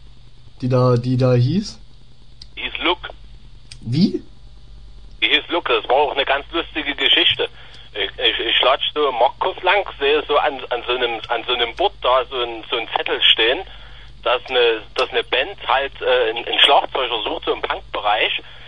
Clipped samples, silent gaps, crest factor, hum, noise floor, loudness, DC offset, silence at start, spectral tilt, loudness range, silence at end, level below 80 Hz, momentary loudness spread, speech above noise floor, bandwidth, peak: under 0.1%; none; 20 dB; none; -45 dBFS; -18 LUFS; 1%; 0.45 s; -5.5 dB/octave; 5 LU; 0 s; -44 dBFS; 11 LU; 27 dB; 10 kHz; 0 dBFS